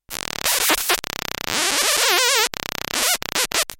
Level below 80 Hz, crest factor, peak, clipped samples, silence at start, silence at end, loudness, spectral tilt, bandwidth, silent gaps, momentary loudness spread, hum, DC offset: -50 dBFS; 20 dB; -2 dBFS; under 0.1%; 0.1 s; 0.05 s; -19 LUFS; 0.5 dB/octave; 17 kHz; none; 10 LU; none; under 0.1%